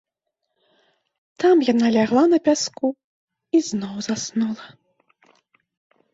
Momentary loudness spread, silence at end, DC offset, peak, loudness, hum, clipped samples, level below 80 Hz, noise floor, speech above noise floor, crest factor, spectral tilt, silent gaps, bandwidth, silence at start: 11 LU; 1.45 s; under 0.1%; -4 dBFS; -20 LUFS; none; under 0.1%; -68 dBFS; -79 dBFS; 60 dB; 18 dB; -4.5 dB/octave; 3.04-3.28 s; 8 kHz; 1.4 s